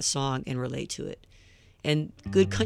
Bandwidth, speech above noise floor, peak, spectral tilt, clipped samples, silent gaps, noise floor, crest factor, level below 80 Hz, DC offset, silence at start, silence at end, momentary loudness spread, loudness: 13.5 kHz; 28 dB; -8 dBFS; -4.5 dB/octave; under 0.1%; none; -56 dBFS; 20 dB; -52 dBFS; under 0.1%; 0 s; 0 s; 12 LU; -29 LUFS